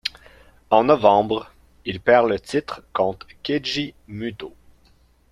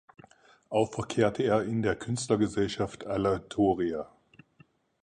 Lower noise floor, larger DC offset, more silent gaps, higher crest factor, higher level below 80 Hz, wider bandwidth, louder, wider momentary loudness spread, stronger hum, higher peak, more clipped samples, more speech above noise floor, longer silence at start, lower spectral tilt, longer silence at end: second, -56 dBFS vs -63 dBFS; neither; neither; about the same, 20 dB vs 20 dB; about the same, -54 dBFS vs -56 dBFS; first, 12.5 kHz vs 10.5 kHz; first, -21 LUFS vs -29 LUFS; first, 16 LU vs 6 LU; neither; first, -2 dBFS vs -10 dBFS; neither; about the same, 36 dB vs 34 dB; second, 0.05 s vs 0.7 s; about the same, -5.5 dB/octave vs -6 dB/octave; about the same, 0.85 s vs 0.95 s